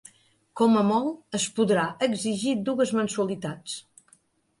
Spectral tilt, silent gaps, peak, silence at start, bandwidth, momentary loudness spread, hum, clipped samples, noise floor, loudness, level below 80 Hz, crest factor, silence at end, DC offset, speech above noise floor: -4.5 dB/octave; none; -10 dBFS; 0.55 s; 11.5 kHz; 13 LU; none; under 0.1%; -63 dBFS; -25 LUFS; -68 dBFS; 16 dB; 0.8 s; under 0.1%; 38 dB